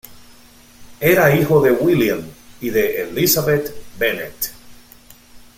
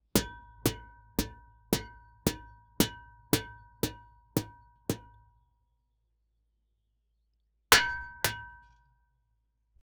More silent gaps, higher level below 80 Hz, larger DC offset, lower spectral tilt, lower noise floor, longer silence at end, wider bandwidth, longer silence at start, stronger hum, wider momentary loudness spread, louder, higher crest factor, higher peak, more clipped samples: neither; about the same, -48 dBFS vs -50 dBFS; neither; first, -5 dB/octave vs -3 dB/octave; second, -46 dBFS vs -76 dBFS; second, 0.2 s vs 1.45 s; second, 16.5 kHz vs over 20 kHz; about the same, 0.1 s vs 0.15 s; neither; second, 13 LU vs 24 LU; first, -17 LUFS vs -31 LUFS; second, 18 dB vs 32 dB; first, 0 dBFS vs -4 dBFS; neither